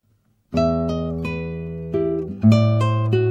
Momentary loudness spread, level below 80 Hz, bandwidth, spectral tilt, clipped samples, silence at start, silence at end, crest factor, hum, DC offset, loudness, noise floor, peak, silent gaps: 11 LU; -42 dBFS; 7.6 kHz; -8.5 dB/octave; under 0.1%; 0.5 s; 0 s; 16 dB; none; under 0.1%; -21 LUFS; -63 dBFS; -4 dBFS; none